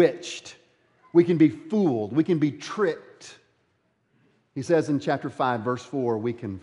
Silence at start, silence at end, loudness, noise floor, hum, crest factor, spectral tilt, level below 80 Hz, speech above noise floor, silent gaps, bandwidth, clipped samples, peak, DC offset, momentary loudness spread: 0 s; 0.05 s; -25 LUFS; -70 dBFS; none; 20 dB; -7 dB/octave; -74 dBFS; 46 dB; none; 11 kHz; under 0.1%; -6 dBFS; under 0.1%; 17 LU